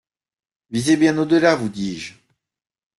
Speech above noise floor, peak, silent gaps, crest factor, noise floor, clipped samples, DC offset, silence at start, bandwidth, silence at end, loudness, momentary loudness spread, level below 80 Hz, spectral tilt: 69 dB; -2 dBFS; none; 18 dB; -87 dBFS; under 0.1%; under 0.1%; 0.7 s; 12 kHz; 0.9 s; -19 LUFS; 14 LU; -58 dBFS; -5 dB/octave